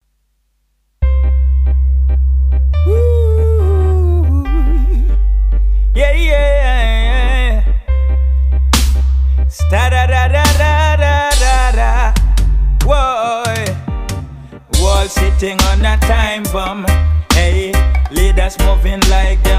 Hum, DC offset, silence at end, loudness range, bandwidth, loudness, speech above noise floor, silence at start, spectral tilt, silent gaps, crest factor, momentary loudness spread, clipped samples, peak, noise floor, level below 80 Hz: none; under 0.1%; 0 s; 3 LU; 16 kHz; -13 LUFS; 50 dB; 1 s; -5 dB/octave; none; 10 dB; 4 LU; under 0.1%; 0 dBFS; -61 dBFS; -12 dBFS